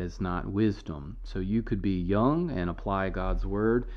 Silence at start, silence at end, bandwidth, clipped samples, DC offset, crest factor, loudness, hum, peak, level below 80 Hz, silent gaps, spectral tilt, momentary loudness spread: 0 s; 0 s; 6.6 kHz; under 0.1%; under 0.1%; 16 dB; -29 LUFS; none; -12 dBFS; -38 dBFS; none; -9 dB/octave; 11 LU